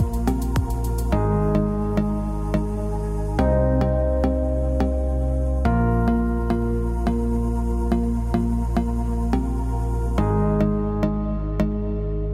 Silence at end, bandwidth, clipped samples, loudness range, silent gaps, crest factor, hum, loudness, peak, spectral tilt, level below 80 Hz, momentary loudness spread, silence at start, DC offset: 0 s; 14 kHz; under 0.1%; 2 LU; none; 12 dB; none; -23 LUFS; -8 dBFS; -8.5 dB/octave; -24 dBFS; 5 LU; 0 s; under 0.1%